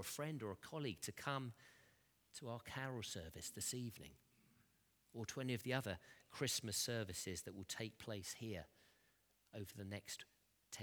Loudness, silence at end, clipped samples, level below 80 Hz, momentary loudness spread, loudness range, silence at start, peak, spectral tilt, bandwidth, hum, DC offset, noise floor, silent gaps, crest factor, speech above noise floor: -47 LUFS; 0 s; under 0.1%; -76 dBFS; 16 LU; 5 LU; 0 s; -24 dBFS; -3.5 dB/octave; over 20 kHz; none; under 0.1%; -78 dBFS; none; 26 dB; 31 dB